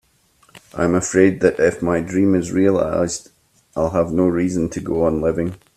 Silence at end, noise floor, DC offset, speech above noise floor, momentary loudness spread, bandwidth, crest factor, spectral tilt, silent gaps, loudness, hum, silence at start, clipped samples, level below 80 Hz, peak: 0.2 s; -57 dBFS; under 0.1%; 39 dB; 8 LU; 13 kHz; 18 dB; -6.5 dB/octave; none; -18 LUFS; none; 0.55 s; under 0.1%; -46 dBFS; 0 dBFS